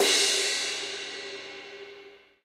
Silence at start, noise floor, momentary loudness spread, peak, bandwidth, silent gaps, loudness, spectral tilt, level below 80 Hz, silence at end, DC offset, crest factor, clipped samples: 0 s; -51 dBFS; 22 LU; -10 dBFS; 16 kHz; none; -26 LUFS; 1.5 dB/octave; -78 dBFS; 0.25 s; under 0.1%; 20 dB; under 0.1%